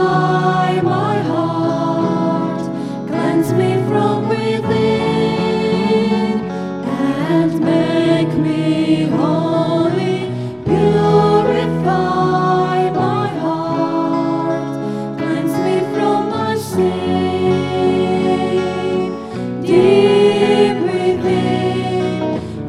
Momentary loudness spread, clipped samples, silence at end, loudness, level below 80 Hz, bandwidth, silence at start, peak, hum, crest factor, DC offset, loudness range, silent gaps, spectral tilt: 8 LU; under 0.1%; 0 s; -16 LUFS; -50 dBFS; 14.5 kHz; 0 s; 0 dBFS; none; 14 dB; 0.2%; 3 LU; none; -7 dB/octave